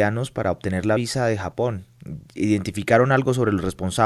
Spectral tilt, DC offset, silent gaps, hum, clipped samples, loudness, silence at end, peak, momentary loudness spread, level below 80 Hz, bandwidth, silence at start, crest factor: -6 dB/octave; under 0.1%; none; none; under 0.1%; -22 LUFS; 0 s; -4 dBFS; 12 LU; -44 dBFS; 12.5 kHz; 0 s; 18 dB